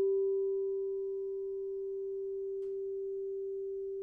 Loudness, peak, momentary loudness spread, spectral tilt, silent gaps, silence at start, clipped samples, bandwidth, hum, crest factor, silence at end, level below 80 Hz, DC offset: -37 LUFS; -26 dBFS; 6 LU; -9.5 dB/octave; none; 0 s; under 0.1%; 1.1 kHz; none; 10 dB; 0 s; -72 dBFS; under 0.1%